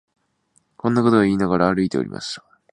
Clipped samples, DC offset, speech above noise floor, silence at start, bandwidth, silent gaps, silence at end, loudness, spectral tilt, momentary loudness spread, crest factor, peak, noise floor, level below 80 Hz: under 0.1%; under 0.1%; 46 dB; 0.85 s; 10.5 kHz; none; 0.35 s; -19 LUFS; -6.5 dB/octave; 14 LU; 20 dB; -2 dBFS; -65 dBFS; -50 dBFS